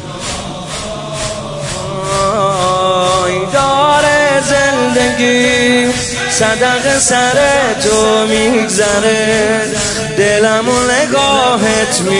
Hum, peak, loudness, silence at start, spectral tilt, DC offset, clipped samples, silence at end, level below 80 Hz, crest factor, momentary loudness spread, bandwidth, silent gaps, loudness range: none; 0 dBFS; -11 LUFS; 0 s; -3 dB/octave; under 0.1%; under 0.1%; 0 s; -36 dBFS; 12 dB; 10 LU; 11.5 kHz; none; 3 LU